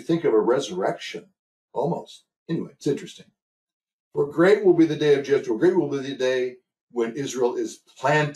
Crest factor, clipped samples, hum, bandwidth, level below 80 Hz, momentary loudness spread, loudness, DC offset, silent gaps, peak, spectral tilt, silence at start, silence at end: 16 dB; under 0.1%; none; 12 kHz; -70 dBFS; 14 LU; -23 LUFS; under 0.1%; 1.39-1.68 s, 2.36-2.46 s, 3.42-3.67 s, 3.73-3.80 s, 3.93-4.11 s, 6.81-6.88 s; -6 dBFS; -6 dB/octave; 0 s; 0 s